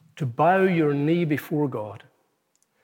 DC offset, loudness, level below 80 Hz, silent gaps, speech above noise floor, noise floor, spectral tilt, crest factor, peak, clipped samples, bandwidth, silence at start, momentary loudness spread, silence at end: under 0.1%; -23 LUFS; -80 dBFS; none; 47 dB; -70 dBFS; -8 dB/octave; 16 dB; -8 dBFS; under 0.1%; 17 kHz; 0.15 s; 13 LU; 0.85 s